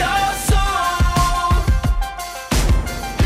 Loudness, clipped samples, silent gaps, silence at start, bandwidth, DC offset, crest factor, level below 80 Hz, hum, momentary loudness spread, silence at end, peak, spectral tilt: -19 LUFS; under 0.1%; none; 0 s; 16 kHz; under 0.1%; 8 dB; -20 dBFS; none; 7 LU; 0 s; -8 dBFS; -4.5 dB/octave